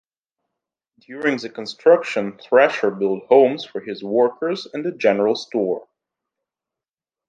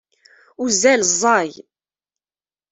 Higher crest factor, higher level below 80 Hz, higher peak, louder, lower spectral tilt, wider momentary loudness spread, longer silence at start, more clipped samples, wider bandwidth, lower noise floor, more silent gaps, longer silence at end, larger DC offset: about the same, 20 dB vs 18 dB; second, -72 dBFS vs -64 dBFS; about the same, -2 dBFS vs -2 dBFS; second, -19 LUFS vs -16 LUFS; first, -5.5 dB/octave vs -1.5 dB/octave; about the same, 13 LU vs 12 LU; first, 1.1 s vs 0.6 s; neither; second, 7.6 kHz vs 8.4 kHz; about the same, under -90 dBFS vs under -90 dBFS; neither; first, 1.45 s vs 1.2 s; neither